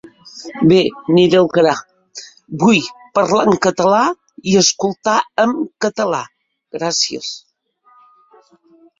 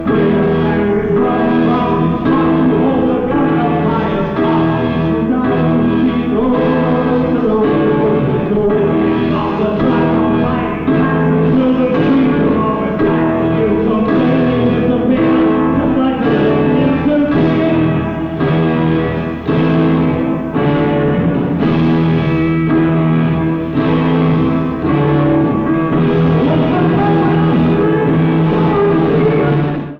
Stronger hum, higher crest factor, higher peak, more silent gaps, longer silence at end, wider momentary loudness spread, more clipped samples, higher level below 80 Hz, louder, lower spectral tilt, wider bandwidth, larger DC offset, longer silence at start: neither; first, 16 dB vs 10 dB; about the same, 0 dBFS vs -2 dBFS; neither; first, 1.6 s vs 0 s; first, 21 LU vs 3 LU; neither; second, -56 dBFS vs -34 dBFS; about the same, -15 LUFS vs -13 LUFS; second, -4 dB/octave vs -10 dB/octave; first, 7.8 kHz vs 5.2 kHz; neither; first, 0.25 s vs 0 s